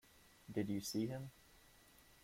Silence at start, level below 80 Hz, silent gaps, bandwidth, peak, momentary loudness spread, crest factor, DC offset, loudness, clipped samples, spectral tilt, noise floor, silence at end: 0.15 s; -72 dBFS; none; 16.5 kHz; -28 dBFS; 24 LU; 18 dB; under 0.1%; -44 LUFS; under 0.1%; -5.5 dB/octave; -67 dBFS; 0.1 s